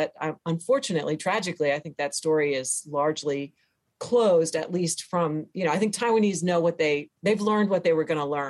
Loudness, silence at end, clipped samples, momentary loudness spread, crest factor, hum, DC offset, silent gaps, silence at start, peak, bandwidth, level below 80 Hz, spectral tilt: -25 LUFS; 0 s; under 0.1%; 7 LU; 14 dB; none; under 0.1%; none; 0 s; -12 dBFS; 12.5 kHz; -70 dBFS; -4.5 dB/octave